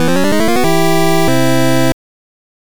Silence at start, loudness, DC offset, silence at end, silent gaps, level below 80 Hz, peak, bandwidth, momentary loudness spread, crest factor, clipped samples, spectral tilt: 0 s; -13 LUFS; 20%; 0.65 s; none; -38 dBFS; -4 dBFS; over 20 kHz; 3 LU; 10 dB; under 0.1%; -5 dB/octave